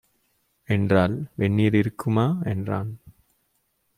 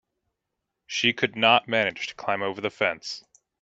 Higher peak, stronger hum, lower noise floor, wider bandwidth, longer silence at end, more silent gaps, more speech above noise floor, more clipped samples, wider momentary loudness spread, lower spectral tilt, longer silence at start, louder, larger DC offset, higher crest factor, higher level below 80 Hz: about the same, -4 dBFS vs -4 dBFS; neither; second, -71 dBFS vs -83 dBFS; first, 13.5 kHz vs 8 kHz; first, 0.85 s vs 0.45 s; neither; second, 49 dB vs 58 dB; neither; second, 9 LU vs 14 LU; first, -8.5 dB/octave vs -3 dB/octave; second, 0.7 s vs 0.9 s; about the same, -23 LUFS vs -24 LUFS; neither; about the same, 20 dB vs 24 dB; first, -56 dBFS vs -70 dBFS